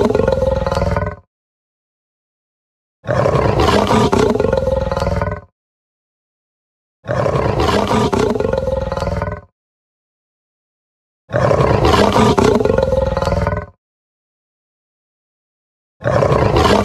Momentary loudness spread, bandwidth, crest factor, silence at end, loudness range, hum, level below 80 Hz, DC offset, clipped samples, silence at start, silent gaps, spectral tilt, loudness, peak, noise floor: 11 LU; 14 kHz; 16 dB; 0 s; 7 LU; none; -28 dBFS; under 0.1%; under 0.1%; 0 s; 1.27-3.03 s, 5.52-7.03 s, 9.52-11.28 s, 13.78-16.00 s; -6.5 dB/octave; -15 LUFS; 0 dBFS; under -90 dBFS